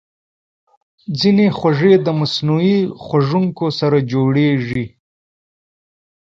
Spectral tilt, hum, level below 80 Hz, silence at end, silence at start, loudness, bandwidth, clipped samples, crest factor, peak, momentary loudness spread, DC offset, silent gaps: -7.5 dB/octave; none; -54 dBFS; 1.4 s; 1.1 s; -16 LUFS; 7.4 kHz; under 0.1%; 16 dB; 0 dBFS; 10 LU; under 0.1%; none